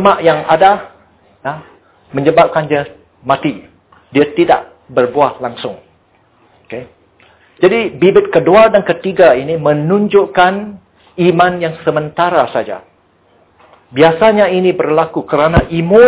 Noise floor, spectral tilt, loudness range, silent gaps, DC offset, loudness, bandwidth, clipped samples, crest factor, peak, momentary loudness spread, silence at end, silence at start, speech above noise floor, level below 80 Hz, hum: -52 dBFS; -10 dB/octave; 6 LU; none; under 0.1%; -12 LUFS; 4 kHz; 0.2%; 12 dB; 0 dBFS; 16 LU; 0 s; 0 s; 41 dB; -36 dBFS; none